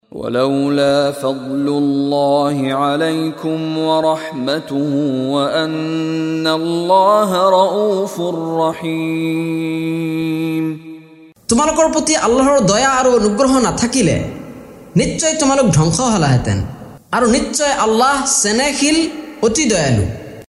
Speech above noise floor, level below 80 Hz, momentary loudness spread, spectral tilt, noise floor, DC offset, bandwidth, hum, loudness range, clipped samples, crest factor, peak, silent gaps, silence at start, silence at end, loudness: 27 dB; -40 dBFS; 8 LU; -4.5 dB/octave; -42 dBFS; under 0.1%; 14.5 kHz; none; 4 LU; under 0.1%; 14 dB; 0 dBFS; none; 0.15 s; 0.05 s; -15 LUFS